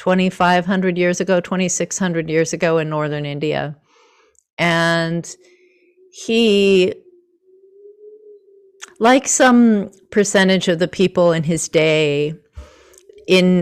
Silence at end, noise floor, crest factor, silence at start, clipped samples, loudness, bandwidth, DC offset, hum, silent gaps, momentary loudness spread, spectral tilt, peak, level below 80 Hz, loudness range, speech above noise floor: 0 s; -55 dBFS; 14 dB; 0 s; under 0.1%; -16 LUFS; 13.5 kHz; under 0.1%; none; 4.53-4.57 s; 10 LU; -4.5 dB/octave; -4 dBFS; -52 dBFS; 6 LU; 39 dB